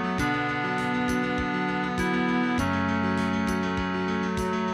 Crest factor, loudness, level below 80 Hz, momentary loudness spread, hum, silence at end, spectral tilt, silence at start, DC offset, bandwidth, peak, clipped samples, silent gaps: 12 dB; -26 LUFS; -44 dBFS; 3 LU; none; 0 s; -6 dB/octave; 0 s; under 0.1%; 13 kHz; -14 dBFS; under 0.1%; none